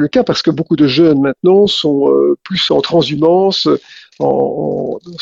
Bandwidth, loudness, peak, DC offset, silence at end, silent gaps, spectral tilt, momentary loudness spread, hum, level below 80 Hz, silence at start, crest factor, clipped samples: 7.8 kHz; -12 LUFS; 0 dBFS; under 0.1%; 0 s; none; -6 dB/octave; 8 LU; none; -50 dBFS; 0 s; 12 dB; under 0.1%